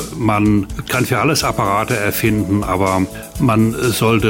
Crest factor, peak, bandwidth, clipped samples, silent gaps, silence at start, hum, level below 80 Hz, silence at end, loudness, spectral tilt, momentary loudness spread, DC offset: 12 dB; -2 dBFS; 16.5 kHz; under 0.1%; none; 0 s; none; -34 dBFS; 0 s; -16 LUFS; -5.5 dB/octave; 4 LU; under 0.1%